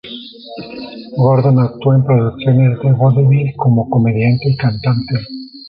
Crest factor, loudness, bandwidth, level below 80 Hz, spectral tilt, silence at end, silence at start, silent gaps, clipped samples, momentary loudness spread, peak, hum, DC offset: 12 dB; -13 LUFS; 5.2 kHz; -46 dBFS; -11.5 dB/octave; 0 s; 0.05 s; none; under 0.1%; 18 LU; -2 dBFS; none; under 0.1%